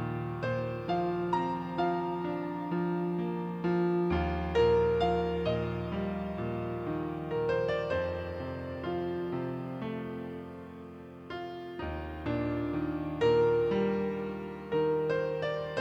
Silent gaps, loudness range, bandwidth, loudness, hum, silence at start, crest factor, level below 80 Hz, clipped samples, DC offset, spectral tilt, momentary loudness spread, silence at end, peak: none; 8 LU; 7.6 kHz; -32 LUFS; none; 0 s; 16 dB; -48 dBFS; under 0.1%; under 0.1%; -8.5 dB/octave; 12 LU; 0 s; -16 dBFS